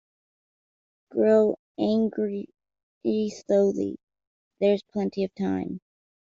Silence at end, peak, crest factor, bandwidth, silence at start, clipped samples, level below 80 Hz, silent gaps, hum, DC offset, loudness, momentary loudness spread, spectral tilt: 0.6 s; -8 dBFS; 18 dB; 7.6 kHz; 1.1 s; under 0.1%; -68 dBFS; 1.59-1.75 s, 2.83-3.01 s, 4.03-4.07 s, 4.27-4.51 s; none; under 0.1%; -26 LUFS; 14 LU; -7 dB/octave